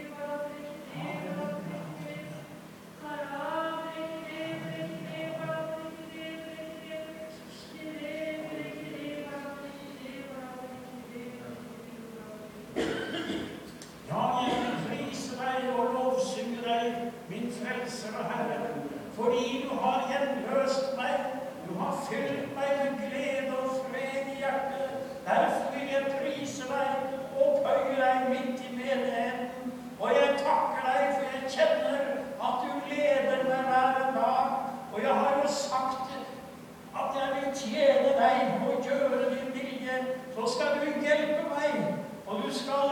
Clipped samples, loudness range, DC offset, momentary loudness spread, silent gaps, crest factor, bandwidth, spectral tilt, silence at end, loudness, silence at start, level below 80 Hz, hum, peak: under 0.1%; 11 LU; under 0.1%; 16 LU; none; 20 dB; 19 kHz; -4.5 dB/octave; 0 s; -31 LUFS; 0 s; -68 dBFS; none; -12 dBFS